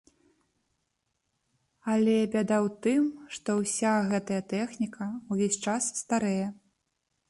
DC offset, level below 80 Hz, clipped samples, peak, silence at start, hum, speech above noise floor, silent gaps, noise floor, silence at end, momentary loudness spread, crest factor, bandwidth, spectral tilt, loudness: under 0.1%; -70 dBFS; under 0.1%; -16 dBFS; 1.85 s; none; 51 dB; none; -79 dBFS; 0.75 s; 8 LU; 14 dB; 11.5 kHz; -5 dB/octave; -29 LUFS